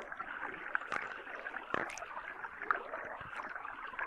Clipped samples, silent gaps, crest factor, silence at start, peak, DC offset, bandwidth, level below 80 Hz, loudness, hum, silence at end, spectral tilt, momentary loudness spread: under 0.1%; none; 28 dB; 0 s; -14 dBFS; under 0.1%; 13 kHz; -70 dBFS; -41 LUFS; none; 0 s; -3 dB/octave; 7 LU